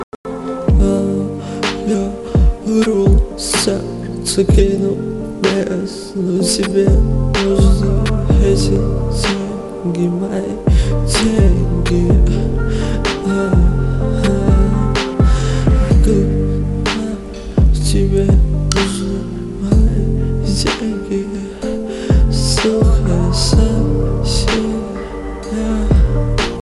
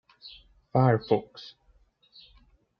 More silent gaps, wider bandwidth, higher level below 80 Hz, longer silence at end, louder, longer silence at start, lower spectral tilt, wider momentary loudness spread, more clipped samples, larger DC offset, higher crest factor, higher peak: first, 0.03-0.24 s vs none; first, 12 kHz vs 5.8 kHz; first, -18 dBFS vs -64 dBFS; second, 0.05 s vs 1.35 s; first, -16 LUFS vs -26 LUFS; second, 0 s vs 0.25 s; second, -6 dB/octave vs -9.5 dB/octave; second, 9 LU vs 24 LU; neither; neither; second, 14 dB vs 22 dB; first, 0 dBFS vs -8 dBFS